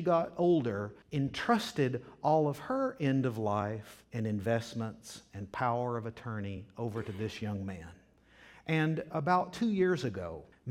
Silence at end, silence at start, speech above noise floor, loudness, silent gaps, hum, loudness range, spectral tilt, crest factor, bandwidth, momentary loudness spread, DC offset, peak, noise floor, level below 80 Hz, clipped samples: 0 s; 0 s; 28 dB; -33 LUFS; none; none; 6 LU; -7 dB/octave; 20 dB; 16 kHz; 14 LU; under 0.1%; -14 dBFS; -60 dBFS; -64 dBFS; under 0.1%